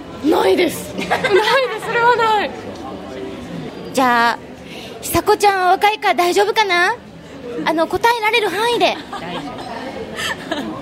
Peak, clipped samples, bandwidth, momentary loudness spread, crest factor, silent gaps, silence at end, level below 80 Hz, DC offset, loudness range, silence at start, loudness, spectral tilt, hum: -2 dBFS; under 0.1%; 16 kHz; 16 LU; 16 dB; none; 0 s; -48 dBFS; under 0.1%; 3 LU; 0 s; -16 LUFS; -3.5 dB/octave; none